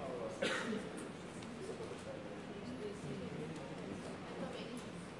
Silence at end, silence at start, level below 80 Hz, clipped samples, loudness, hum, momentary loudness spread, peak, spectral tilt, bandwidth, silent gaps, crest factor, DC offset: 0 s; 0 s; -70 dBFS; under 0.1%; -45 LUFS; none; 8 LU; -24 dBFS; -5 dB/octave; 11.5 kHz; none; 22 dB; under 0.1%